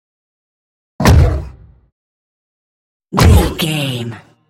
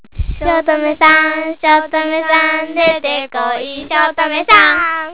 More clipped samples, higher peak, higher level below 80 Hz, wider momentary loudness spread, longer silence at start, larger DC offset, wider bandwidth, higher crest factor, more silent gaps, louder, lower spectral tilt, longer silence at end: about the same, 0.1% vs 0.2%; about the same, 0 dBFS vs 0 dBFS; first, -22 dBFS vs -32 dBFS; first, 14 LU vs 10 LU; first, 1 s vs 0.15 s; second, under 0.1% vs 1%; first, 17 kHz vs 4 kHz; about the same, 16 dB vs 14 dB; first, 1.92-3.00 s vs none; about the same, -13 LUFS vs -12 LUFS; second, -5.5 dB/octave vs -7 dB/octave; first, 0.3 s vs 0 s